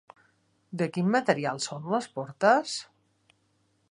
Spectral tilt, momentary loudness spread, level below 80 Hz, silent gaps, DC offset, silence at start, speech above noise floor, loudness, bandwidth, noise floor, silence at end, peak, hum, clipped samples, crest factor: -5 dB/octave; 13 LU; -78 dBFS; none; under 0.1%; 0.7 s; 44 dB; -27 LUFS; 11.5 kHz; -70 dBFS; 1.1 s; -6 dBFS; none; under 0.1%; 24 dB